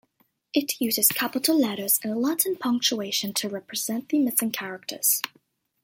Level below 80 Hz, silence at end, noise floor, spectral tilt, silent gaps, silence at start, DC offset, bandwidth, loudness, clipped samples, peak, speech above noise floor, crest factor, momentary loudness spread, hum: -74 dBFS; 0.55 s; -68 dBFS; -2 dB/octave; none; 0.55 s; under 0.1%; 17 kHz; -24 LUFS; under 0.1%; -4 dBFS; 43 dB; 22 dB; 9 LU; none